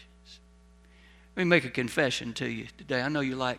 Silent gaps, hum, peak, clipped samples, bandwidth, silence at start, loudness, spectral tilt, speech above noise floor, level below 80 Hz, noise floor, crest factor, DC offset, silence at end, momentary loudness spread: none; none; -6 dBFS; under 0.1%; 15 kHz; 0 s; -28 LUFS; -5 dB/octave; 28 dB; -58 dBFS; -57 dBFS; 24 dB; under 0.1%; 0 s; 10 LU